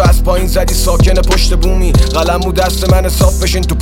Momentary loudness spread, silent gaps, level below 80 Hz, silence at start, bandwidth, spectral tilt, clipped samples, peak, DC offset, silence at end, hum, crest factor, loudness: 3 LU; none; -12 dBFS; 0 s; 16.5 kHz; -5 dB/octave; under 0.1%; 0 dBFS; under 0.1%; 0 s; none; 10 dB; -12 LUFS